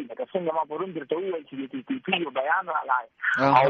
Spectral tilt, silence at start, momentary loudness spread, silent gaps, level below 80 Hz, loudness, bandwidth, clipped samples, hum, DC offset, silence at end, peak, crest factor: -3 dB/octave; 0 s; 8 LU; none; -68 dBFS; -27 LUFS; 7.4 kHz; under 0.1%; none; under 0.1%; 0 s; -4 dBFS; 22 dB